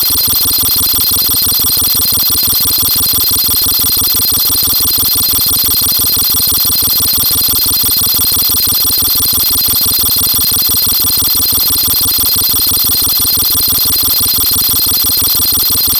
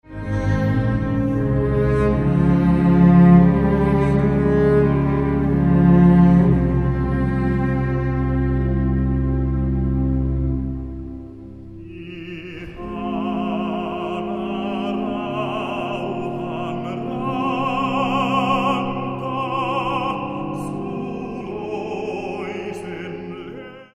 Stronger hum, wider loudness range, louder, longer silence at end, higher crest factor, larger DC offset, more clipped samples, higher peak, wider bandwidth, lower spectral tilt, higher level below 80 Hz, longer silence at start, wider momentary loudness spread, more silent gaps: neither; second, 0 LU vs 12 LU; first, -7 LUFS vs -20 LUFS; about the same, 0 s vs 0.1 s; second, 10 dB vs 18 dB; neither; neither; about the same, 0 dBFS vs -2 dBFS; first, 20 kHz vs 5.8 kHz; second, -1 dB/octave vs -9 dB/octave; about the same, -34 dBFS vs -30 dBFS; about the same, 0 s vs 0.1 s; second, 0 LU vs 17 LU; neither